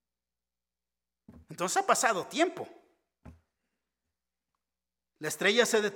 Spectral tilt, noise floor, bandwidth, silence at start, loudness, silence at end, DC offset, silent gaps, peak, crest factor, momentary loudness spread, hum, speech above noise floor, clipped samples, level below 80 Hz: -2 dB/octave; under -90 dBFS; 17.5 kHz; 1.3 s; -28 LUFS; 0 s; under 0.1%; none; -8 dBFS; 24 dB; 18 LU; none; over 61 dB; under 0.1%; -70 dBFS